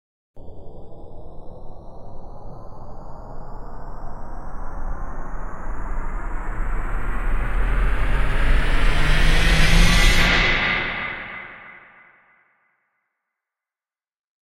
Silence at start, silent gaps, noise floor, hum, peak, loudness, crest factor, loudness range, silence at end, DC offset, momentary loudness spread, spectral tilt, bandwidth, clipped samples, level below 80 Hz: 0.35 s; none; under -90 dBFS; none; -2 dBFS; -22 LUFS; 18 dB; 22 LU; 2.75 s; under 0.1%; 26 LU; -4 dB/octave; 13 kHz; under 0.1%; -24 dBFS